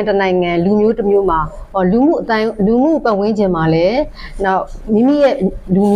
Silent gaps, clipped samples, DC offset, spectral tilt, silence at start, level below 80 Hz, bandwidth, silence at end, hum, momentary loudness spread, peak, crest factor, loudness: none; under 0.1%; under 0.1%; -8 dB/octave; 0 s; -32 dBFS; 10 kHz; 0 s; none; 6 LU; -4 dBFS; 10 dB; -14 LUFS